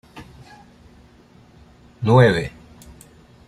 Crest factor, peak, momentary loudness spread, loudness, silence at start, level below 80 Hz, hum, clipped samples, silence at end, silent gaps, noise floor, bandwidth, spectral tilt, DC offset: 20 dB; -2 dBFS; 28 LU; -17 LUFS; 0.15 s; -48 dBFS; none; under 0.1%; 1 s; none; -50 dBFS; 11.5 kHz; -7.5 dB/octave; under 0.1%